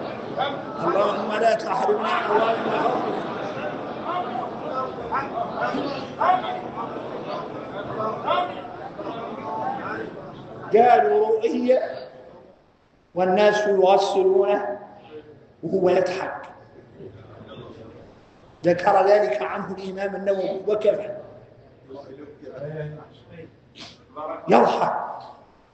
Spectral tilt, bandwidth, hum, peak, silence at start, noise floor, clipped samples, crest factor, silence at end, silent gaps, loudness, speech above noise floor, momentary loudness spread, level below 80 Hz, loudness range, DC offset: -6 dB/octave; 8.6 kHz; none; -2 dBFS; 0 s; -59 dBFS; under 0.1%; 22 dB; 0.4 s; none; -23 LUFS; 37 dB; 23 LU; -64 dBFS; 8 LU; under 0.1%